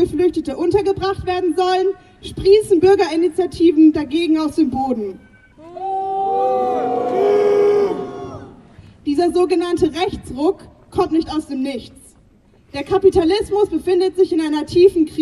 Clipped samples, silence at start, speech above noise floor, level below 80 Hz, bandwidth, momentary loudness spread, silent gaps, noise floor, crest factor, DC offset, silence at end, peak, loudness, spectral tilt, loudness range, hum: under 0.1%; 0 s; 35 dB; -44 dBFS; 12 kHz; 14 LU; none; -51 dBFS; 16 dB; under 0.1%; 0 s; -2 dBFS; -17 LUFS; -6 dB/octave; 5 LU; none